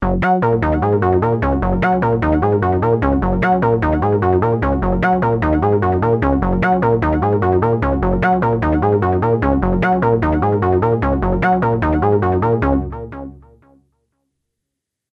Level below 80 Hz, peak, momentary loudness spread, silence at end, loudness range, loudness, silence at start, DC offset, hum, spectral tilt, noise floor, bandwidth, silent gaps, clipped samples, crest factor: -28 dBFS; -2 dBFS; 2 LU; 1.75 s; 2 LU; -16 LUFS; 0 s; under 0.1%; none; -10 dB/octave; -80 dBFS; 6 kHz; none; under 0.1%; 14 dB